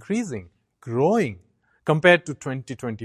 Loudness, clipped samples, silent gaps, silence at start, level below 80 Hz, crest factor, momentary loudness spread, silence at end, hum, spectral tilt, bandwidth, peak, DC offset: -22 LUFS; under 0.1%; none; 0.1 s; -58 dBFS; 22 dB; 16 LU; 0 s; none; -6 dB/octave; 12 kHz; -2 dBFS; under 0.1%